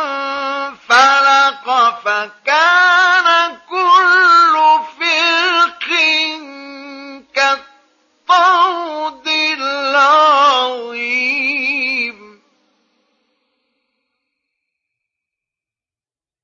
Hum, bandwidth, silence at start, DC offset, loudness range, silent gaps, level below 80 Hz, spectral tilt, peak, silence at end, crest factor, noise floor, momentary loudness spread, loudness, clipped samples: none; 9 kHz; 0 s; under 0.1%; 9 LU; none; -70 dBFS; 0.5 dB/octave; 0 dBFS; 4.3 s; 14 dB; under -90 dBFS; 13 LU; -12 LUFS; under 0.1%